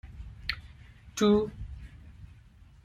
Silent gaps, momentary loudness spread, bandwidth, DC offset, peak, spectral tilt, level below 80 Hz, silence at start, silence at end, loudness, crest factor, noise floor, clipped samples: none; 26 LU; 15 kHz; under 0.1%; -10 dBFS; -5.5 dB/octave; -48 dBFS; 0.05 s; 0.6 s; -30 LUFS; 22 dB; -55 dBFS; under 0.1%